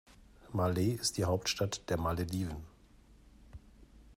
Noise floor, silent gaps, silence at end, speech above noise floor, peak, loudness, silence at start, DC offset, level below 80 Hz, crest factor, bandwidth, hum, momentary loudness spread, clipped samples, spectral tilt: -60 dBFS; none; 0.05 s; 27 dB; -20 dBFS; -34 LUFS; 0.2 s; under 0.1%; -54 dBFS; 16 dB; 16 kHz; none; 8 LU; under 0.1%; -5 dB/octave